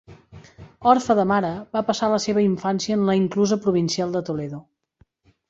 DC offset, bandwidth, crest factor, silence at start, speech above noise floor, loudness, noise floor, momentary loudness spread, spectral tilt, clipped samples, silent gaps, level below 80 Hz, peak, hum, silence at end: under 0.1%; 8 kHz; 20 dB; 0.1 s; 41 dB; -21 LUFS; -61 dBFS; 8 LU; -5.5 dB/octave; under 0.1%; none; -58 dBFS; -2 dBFS; none; 0.9 s